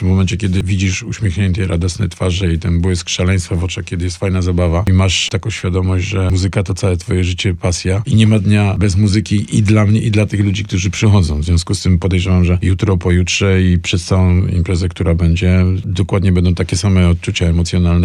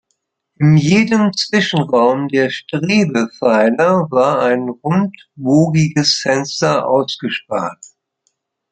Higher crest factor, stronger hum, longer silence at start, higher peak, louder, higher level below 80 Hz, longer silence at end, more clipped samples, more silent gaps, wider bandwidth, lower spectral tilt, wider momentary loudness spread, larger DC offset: about the same, 12 dB vs 14 dB; neither; second, 0 s vs 0.6 s; about the same, -2 dBFS vs 0 dBFS; about the same, -14 LUFS vs -15 LUFS; first, -28 dBFS vs -56 dBFS; second, 0 s vs 1 s; neither; neither; first, 11 kHz vs 9 kHz; about the same, -6 dB/octave vs -5.5 dB/octave; second, 5 LU vs 8 LU; neither